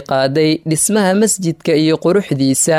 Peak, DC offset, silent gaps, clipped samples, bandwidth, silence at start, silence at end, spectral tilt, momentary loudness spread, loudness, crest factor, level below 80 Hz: -4 dBFS; under 0.1%; none; under 0.1%; 16 kHz; 0 s; 0 s; -4.5 dB/octave; 3 LU; -14 LUFS; 10 dB; -54 dBFS